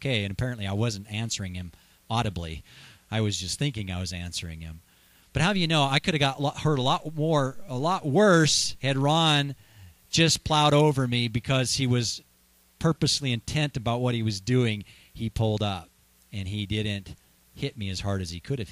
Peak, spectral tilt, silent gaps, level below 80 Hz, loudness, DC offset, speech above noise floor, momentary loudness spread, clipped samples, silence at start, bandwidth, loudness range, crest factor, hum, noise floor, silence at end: -6 dBFS; -4.5 dB/octave; none; -50 dBFS; -26 LUFS; under 0.1%; 36 dB; 14 LU; under 0.1%; 0 s; 14.5 kHz; 8 LU; 20 dB; none; -62 dBFS; 0 s